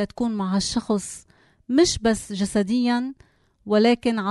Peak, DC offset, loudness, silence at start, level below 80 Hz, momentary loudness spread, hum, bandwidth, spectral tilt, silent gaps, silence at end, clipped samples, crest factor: -6 dBFS; under 0.1%; -22 LUFS; 0 s; -48 dBFS; 8 LU; none; 12 kHz; -4.5 dB/octave; none; 0 s; under 0.1%; 16 dB